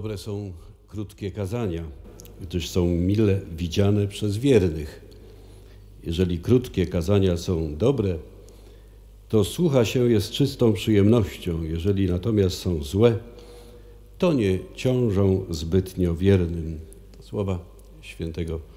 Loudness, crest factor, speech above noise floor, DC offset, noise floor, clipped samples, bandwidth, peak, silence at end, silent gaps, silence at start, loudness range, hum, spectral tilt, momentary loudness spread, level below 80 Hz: -24 LUFS; 20 dB; 24 dB; under 0.1%; -47 dBFS; under 0.1%; 16 kHz; -4 dBFS; 0 s; none; 0 s; 4 LU; none; -7 dB/octave; 14 LU; -42 dBFS